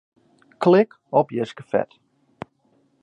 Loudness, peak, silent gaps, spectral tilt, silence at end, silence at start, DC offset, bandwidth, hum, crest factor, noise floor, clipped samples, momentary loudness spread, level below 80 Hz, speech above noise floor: -21 LUFS; -4 dBFS; none; -8 dB/octave; 1.2 s; 0.6 s; under 0.1%; 9.2 kHz; none; 20 dB; -63 dBFS; under 0.1%; 24 LU; -68 dBFS; 43 dB